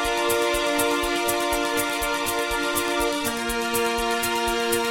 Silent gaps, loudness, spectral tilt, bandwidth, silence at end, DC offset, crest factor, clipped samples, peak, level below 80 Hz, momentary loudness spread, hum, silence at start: none; -23 LUFS; -2 dB/octave; 17 kHz; 0 s; under 0.1%; 16 dB; under 0.1%; -8 dBFS; -42 dBFS; 2 LU; none; 0 s